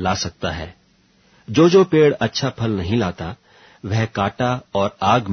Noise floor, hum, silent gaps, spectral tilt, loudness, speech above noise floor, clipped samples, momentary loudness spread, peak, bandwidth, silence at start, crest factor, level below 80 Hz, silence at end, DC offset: -57 dBFS; none; none; -6 dB/octave; -19 LUFS; 39 dB; under 0.1%; 17 LU; -2 dBFS; 6.6 kHz; 0 s; 16 dB; -46 dBFS; 0 s; under 0.1%